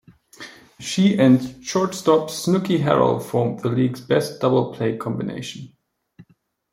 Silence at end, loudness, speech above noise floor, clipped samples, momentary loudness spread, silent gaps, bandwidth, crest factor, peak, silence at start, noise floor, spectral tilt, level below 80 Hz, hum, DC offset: 0.5 s; -20 LUFS; 41 dB; under 0.1%; 17 LU; none; 16.5 kHz; 18 dB; -2 dBFS; 0.4 s; -60 dBFS; -6 dB/octave; -58 dBFS; none; under 0.1%